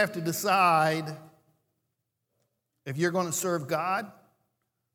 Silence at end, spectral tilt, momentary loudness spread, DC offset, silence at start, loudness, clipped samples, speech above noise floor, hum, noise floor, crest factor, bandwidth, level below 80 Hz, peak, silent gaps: 0.85 s; -4 dB/octave; 19 LU; under 0.1%; 0 s; -27 LUFS; under 0.1%; 54 dB; none; -81 dBFS; 20 dB; 19 kHz; -80 dBFS; -10 dBFS; none